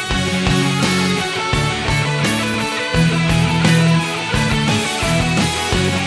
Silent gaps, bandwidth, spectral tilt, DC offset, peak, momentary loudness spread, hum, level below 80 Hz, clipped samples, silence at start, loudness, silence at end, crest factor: none; 11 kHz; -4.5 dB/octave; under 0.1%; -2 dBFS; 4 LU; none; -32 dBFS; under 0.1%; 0 s; -16 LUFS; 0 s; 16 dB